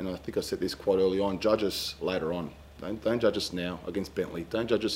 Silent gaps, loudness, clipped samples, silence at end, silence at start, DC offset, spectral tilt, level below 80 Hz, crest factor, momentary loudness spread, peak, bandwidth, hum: none; -30 LUFS; under 0.1%; 0 s; 0 s; under 0.1%; -5 dB/octave; -54 dBFS; 18 dB; 8 LU; -12 dBFS; 16 kHz; none